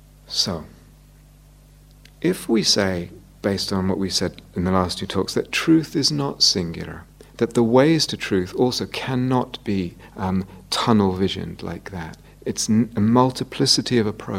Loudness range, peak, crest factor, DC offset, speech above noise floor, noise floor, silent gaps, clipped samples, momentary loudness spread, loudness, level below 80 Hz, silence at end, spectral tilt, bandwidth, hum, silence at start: 4 LU; -2 dBFS; 20 dB; under 0.1%; 27 dB; -48 dBFS; none; under 0.1%; 15 LU; -21 LUFS; -48 dBFS; 0 s; -4.5 dB/octave; 16 kHz; 50 Hz at -50 dBFS; 0.3 s